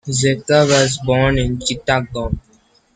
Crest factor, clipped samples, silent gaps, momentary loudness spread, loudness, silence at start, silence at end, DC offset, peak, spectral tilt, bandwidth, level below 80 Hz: 16 dB; under 0.1%; none; 11 LU; -16 LUFS; 0.05 s; 0.55 s; under 0.1%; -2 dBFS; -4.5 dB/octave; 9.6 kHz; -34 dBFS